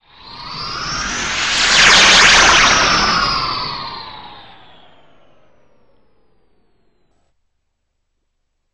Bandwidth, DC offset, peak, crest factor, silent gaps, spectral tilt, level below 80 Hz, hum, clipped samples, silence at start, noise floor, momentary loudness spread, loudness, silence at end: 11.5 kHz; 0.5%; 0 dBFS; 16 dB; none; -0.5 dB/octave; -38 dBFS; none; under 0.1%; 0.25 s; -70 dBFS; 22 LU; -10 LUFS; 4.35 s